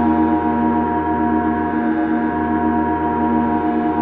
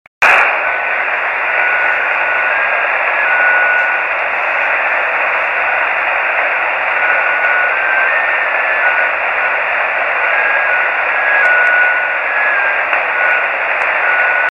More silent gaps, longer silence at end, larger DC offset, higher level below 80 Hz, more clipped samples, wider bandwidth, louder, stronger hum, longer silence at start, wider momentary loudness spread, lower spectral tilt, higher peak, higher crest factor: neither; about the same, 0 s vs 0 s; neither; first, -38 dBFS vs -56 dBFS; neither; second, 3.9 kHz vs 11.5 kHz; second, -18 LUFS vs -12 LUFS; neither; second, 0 s vs 0.2 s; about the same, 2 LU vs 4 LU; first, -11 dB/octave vs -2 dB/octave; second, -6 dBFS vs 0 dBFS; about the same, 12 dB vs 14 dB